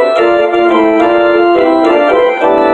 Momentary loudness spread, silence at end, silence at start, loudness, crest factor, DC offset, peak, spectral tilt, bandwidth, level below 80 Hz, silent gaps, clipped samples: 1 LU; 0 s; 0 s; -9 LUFS; 8 dB; under 0.1%; 0 dBFS; -5.5 dB/octave; 8.4 kHz; -46 dBFS; none; under 0.1%